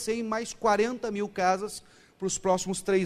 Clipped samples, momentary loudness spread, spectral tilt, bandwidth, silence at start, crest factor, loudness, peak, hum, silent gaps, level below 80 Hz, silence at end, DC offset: under 0.1%; 8 LU; -4 dB/octave; 15 kHz; 0 s; 18 dB; -28 LUFS; -10 dBFS; none; none; -58 dBFS; 0 s; under 0.1%